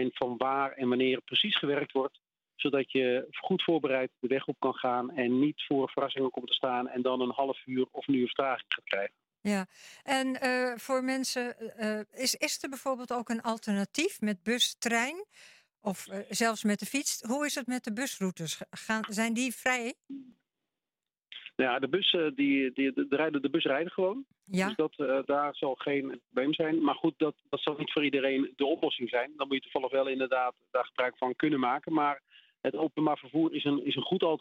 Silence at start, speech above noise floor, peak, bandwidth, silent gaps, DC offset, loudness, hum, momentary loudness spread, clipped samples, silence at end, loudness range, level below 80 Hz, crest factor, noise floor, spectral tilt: 0 s; over 59 dB; -12 dBFS; 16.5 kHz; none; under 0.1%; -31 LUFS; none; 7 LU; under 0.1%; 0 s; 3 LU; -80 dBFS; 18 dB; under -90 dBFS; -3.5 dB/octave